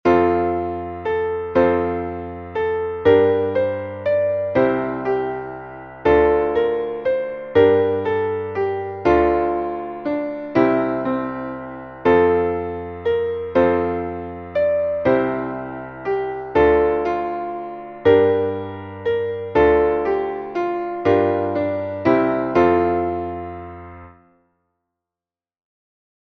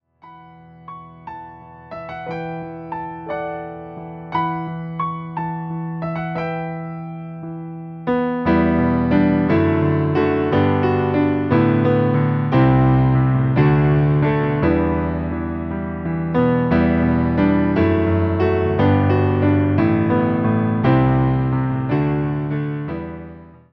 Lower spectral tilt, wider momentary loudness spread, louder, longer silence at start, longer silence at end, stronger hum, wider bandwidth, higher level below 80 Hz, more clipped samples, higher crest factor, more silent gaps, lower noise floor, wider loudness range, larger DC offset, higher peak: second, -8.5 dB/octave vs -11 dB/octave; second, 13 LU vs 16 LU; about the same, -20 LUFS vs -18 LUFS; second, 0.05 s vs 0.25 s; first, 2.15 s vs 0.25 s; neither; first, 6.2 kHz vs 5.4 kHz; second, -44 dBFS vs -38 dBFS; neither; about the same, 16 dB vs 14 dB; neither; first, under -90 dBFS vs -44 dBFS; second, 2 LU vs 11 LU; neither; about the same, -2 dBFS vs -4 dBFS